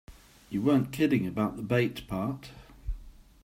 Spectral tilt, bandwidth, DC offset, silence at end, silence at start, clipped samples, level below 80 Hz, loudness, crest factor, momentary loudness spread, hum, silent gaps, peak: -7 dB/octave; 16 kHz; under 0.1%; 0.3 s; 0.1 s; under 0.1%; -46 dBFS; -29 LUFS; 18 dB; 17 LU; none; none; -12 dBFS